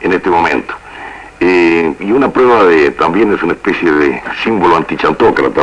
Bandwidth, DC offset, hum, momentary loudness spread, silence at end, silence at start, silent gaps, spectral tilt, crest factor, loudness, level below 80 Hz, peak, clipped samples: 10 kHz; under 0.1%; none; 9 LU; 0 s; 0 s; none; -6.5 dB/octave; 10 dB; -11 LUFS; -40 dBFS; 0 dBFS; under 0.1%